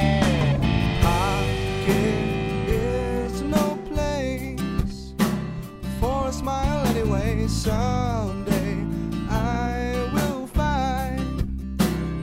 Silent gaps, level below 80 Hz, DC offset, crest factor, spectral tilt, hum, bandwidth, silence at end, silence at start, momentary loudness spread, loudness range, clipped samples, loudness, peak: none; -30 dBFS; under 0.1%; 16 dB; -6 dB/octave; none; 16 kHz; 0 s; 0 s; 6 LU; 3 LU; under 0.1%; -24 LUFS; -6 dBFS